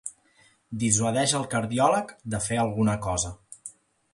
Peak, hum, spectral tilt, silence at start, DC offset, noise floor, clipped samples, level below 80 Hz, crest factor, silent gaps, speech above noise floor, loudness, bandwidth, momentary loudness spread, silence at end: -8 dBFS; none; -4 dB/octave; 0.05 s; under 0.1%; -61 dBFS; under 0.1%; -50 dBFS; 20 dB; none; 36 dB; -25 LUFS; 11.5 kHz; 18 LU; 0.45 s